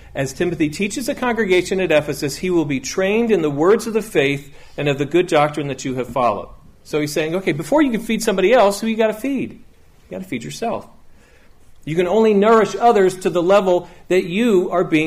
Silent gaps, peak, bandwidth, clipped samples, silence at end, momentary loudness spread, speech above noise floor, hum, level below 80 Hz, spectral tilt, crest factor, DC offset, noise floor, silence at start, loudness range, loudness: none; -4 dBFS; 15.5 kHz; under 0.1%; 0 s; 11 LU; 29 dB; none; -46 dBFS; -5.5 dB/octave; 14 dB; under 0.1%; -46 dBFS; 0.05 s; 4 LU; -18 LUFS